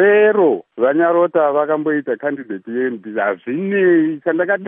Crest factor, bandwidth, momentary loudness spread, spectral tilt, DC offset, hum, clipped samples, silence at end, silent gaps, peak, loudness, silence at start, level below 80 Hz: 14 dB; 3.7 kHz; 9 LU; -11 dB/octave; under 0.1%; none; under 0.1%; 0 s; none; -2 dBFS; -16 LUFS; 0 s; -76 dBFS